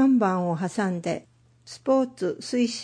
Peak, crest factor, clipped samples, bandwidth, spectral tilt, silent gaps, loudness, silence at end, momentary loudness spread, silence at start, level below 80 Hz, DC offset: -10 dBFS; 14 dB; under 0.1%; 10.5 kHz; -6 dB/octave; none; -26 LUFS; 0 s; 11 LU; 0 s; -70 dBFS; under 0.1%